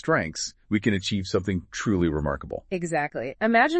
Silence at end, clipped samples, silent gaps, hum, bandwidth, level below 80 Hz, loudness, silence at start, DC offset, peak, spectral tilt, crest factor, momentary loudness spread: 0 s; under 0.1%; none; none; 8.8 kHz; -46 dBFS; -26 LUFS; 0.05 s; under 0.1%; -6 dBFS; -5 dB/octave; 20 dB; 7 LU